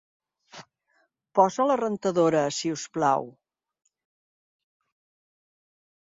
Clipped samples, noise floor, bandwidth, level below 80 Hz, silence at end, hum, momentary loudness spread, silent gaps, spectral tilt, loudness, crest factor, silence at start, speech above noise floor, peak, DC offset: under 0.1%; -70 dBFS; 7.8 kHz; -74 dBFS; 2.8 s; none; 8 LU; none; -5 dB/octave; -25 LUFS; 24 dB; 0.55 s; 47 dB; -6 dBFS; under 0.1%